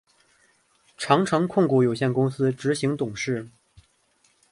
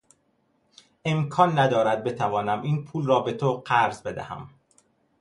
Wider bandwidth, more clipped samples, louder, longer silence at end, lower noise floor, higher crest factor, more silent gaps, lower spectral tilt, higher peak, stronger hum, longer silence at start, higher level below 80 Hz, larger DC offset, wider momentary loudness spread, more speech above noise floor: about the same, 11.5 kHz vs 11.5 kHz; neither; about the same, -23 LUFS vs -24 LUFS; first, 1.05 s vs 0.7 s; about the same, -65 dBFS vs -68 dBFS; about the same, 20 dB vs 22 dB; neither; about the same, -6 dB/octave vs -6.5 dB/octave; about the same, -4 dBFS vs -4 dBFS; neither; about the same, 1 s vs 1.05 s; about the same, -62 dBFS vs -62 dBFS; neither; second, 9 LU vs 13 LU; about the same, 42 dB vs 45 dB